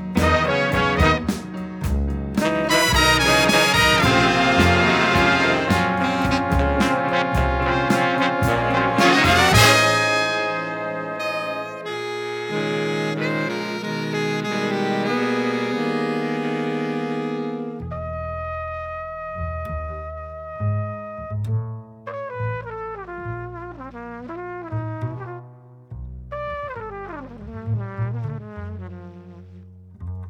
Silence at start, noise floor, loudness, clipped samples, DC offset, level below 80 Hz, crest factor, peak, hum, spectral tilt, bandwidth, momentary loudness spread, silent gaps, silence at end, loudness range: 0 s; -44 dBFS; -20 LUFS; under 0.1%; under 0.1%; -36 dBFS; 20 dB; -2 dBFS; none; -4.5 dB/octave; over 20 kHz; 19 LU; none; 0 s; 15 LU